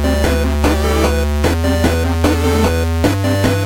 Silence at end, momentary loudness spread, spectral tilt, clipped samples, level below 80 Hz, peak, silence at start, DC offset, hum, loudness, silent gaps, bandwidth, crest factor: 0 s; 1 LU; -6 dB/octave; under 0.1%; -22 dBFS; -2 dBFS; 0 s; under 0.1%; none; -15 LUFS; none; 17 kHz; 12 dB